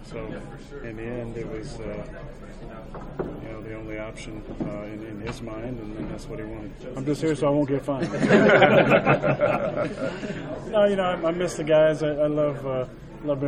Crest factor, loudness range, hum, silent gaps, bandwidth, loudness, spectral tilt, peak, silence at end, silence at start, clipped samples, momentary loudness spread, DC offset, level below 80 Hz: 22 dB; 15 LU; none; none; 10.5 kHz; -24 LUFS; -6.5 dB/octave; -2 dBFS; 0 s; 0 s; under 0.1%; 19 LU; under 0.1%; -44 dBFS